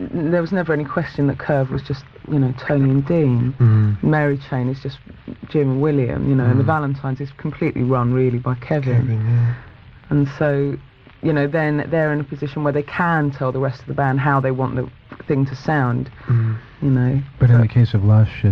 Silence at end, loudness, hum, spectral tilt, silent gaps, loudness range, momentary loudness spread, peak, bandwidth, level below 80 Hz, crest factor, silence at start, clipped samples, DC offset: 0 s; -19 LUFS; none; -10 dB/octave; none; 2 LU; 10 LU; -4 dBFS; 5.8 kHz; -44 dBFS; 14 dB; 0 s; under 0.1%; under 0.1%